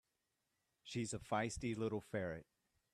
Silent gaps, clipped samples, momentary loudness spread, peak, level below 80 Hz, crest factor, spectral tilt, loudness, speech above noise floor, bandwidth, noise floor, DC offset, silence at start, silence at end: none; under 0.1%; 8 LU; -26 dBFS; -66 dBFS; 20 dB; -5 dB/octave; -43 LUFS; 45 dB; 13.5 kHz; -87 dBFS; under 0.1%; 0.85 s; 0.5 s